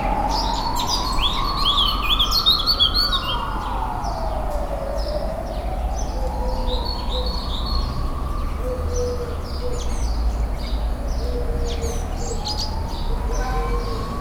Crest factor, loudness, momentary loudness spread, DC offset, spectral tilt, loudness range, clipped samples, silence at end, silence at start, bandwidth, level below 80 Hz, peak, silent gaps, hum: 16 dB; -23 LUFS; 12 LU; under 0.1%; -4 dB/octave; 8 LU; under 0.1%; 0 s; 0 s; 17.5 kHz; -24 dBFS; -6 dBFS; none; none